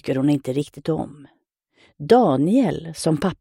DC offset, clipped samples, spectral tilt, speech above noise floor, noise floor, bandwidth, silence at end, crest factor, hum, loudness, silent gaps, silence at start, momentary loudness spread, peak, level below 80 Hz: under 0.1%; under 0.1%; -7 dB/octave; 41 dB; -61 dBFS; 15.5 kHz; 0.05 s; 18 dB; none; -20 LUFS; none; 0.05 s; 11 LU; -2 dBFS; -54 dBFS